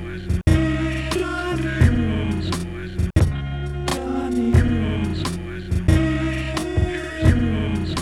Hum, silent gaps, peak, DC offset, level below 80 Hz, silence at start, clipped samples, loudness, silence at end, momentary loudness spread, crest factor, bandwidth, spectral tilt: none; none; -4 dBFS; under 0.1%; -28 dBFS; 0 s; under 0.1%; -22 LUFS; 0 s; 8 LU; 18 dB; 12.5 kHz; -6.5 dB/octave